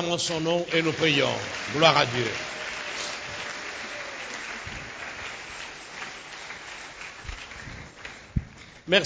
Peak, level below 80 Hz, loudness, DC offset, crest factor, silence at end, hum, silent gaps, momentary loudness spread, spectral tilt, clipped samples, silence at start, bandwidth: -4 dBFS; -48 dBFS; -27 LUFS; under 0.1%; 24 dB; 0 s; none; none; 17 LU; -3.5 dB/octave; under 0.1%; 0 s; 8 kHz